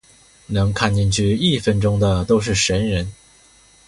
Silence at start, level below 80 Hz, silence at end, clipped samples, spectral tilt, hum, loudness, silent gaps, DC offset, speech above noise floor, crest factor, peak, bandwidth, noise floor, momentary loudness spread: 0.5 s; -36 dBFS; 0.75 s; under 0.1%; -5 dB/octave; none; -18 LUFS; none; under 0.1%; 33 dB; 18 dB; -2 dBFS; 11.5 kHz; -51 dBFS; 6 LU